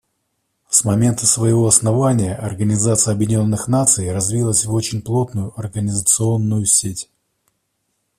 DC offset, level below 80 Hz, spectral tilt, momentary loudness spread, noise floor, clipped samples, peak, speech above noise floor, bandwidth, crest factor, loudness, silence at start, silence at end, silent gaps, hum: under 0.1%; -48 dBFS; -5 dB/octave; 10 LU; -71 dBFS; under 0.1%; 0 dBFS; 54 dB; 15 kHz; 18 dB; -16 LUFS; 0.7 s; 1.15 s; none; none